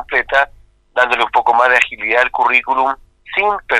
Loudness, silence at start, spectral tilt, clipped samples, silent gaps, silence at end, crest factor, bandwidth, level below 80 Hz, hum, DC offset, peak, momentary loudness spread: -14 LUFS; 0 s; -2 dB/octave; under 0.1%; none; 0 s; 16 dB; 13 kHz; -46 dBFS; none; under 0.1%; 0 dBFS; 9 LU